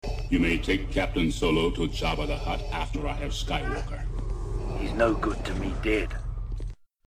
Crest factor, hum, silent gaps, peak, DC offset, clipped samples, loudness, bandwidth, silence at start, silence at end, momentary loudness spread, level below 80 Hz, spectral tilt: 18 dB; none; none; -10 dBFS; 0.1%; under 0.1%; -29 LUFS; 13.5 kHz; 0.05 s; 0.3 s; 10 LU; -32 dBFS; -5.5 dB/octave